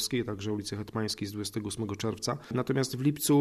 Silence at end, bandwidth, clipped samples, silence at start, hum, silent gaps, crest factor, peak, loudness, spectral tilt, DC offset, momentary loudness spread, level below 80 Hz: 0 s; 14 kHz; under 0.1%; 0 s; none; none; 16 dB; -14 dBFS; -32 LUFS; -5 dB/octave; under 0.1%; 6 LU; -60 dBFS